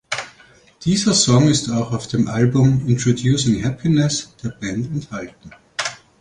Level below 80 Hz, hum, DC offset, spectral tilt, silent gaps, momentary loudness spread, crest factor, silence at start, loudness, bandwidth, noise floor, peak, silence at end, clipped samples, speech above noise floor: -46 dBFS; none; under 0.1%; -5 dB/octave; none; 14 LU; 16 dB; 0.1 s; -18 LUFS; 11 kHz; -50 dBFS; -2 dBFS; 0.25 s; under 0.1%; 32 dB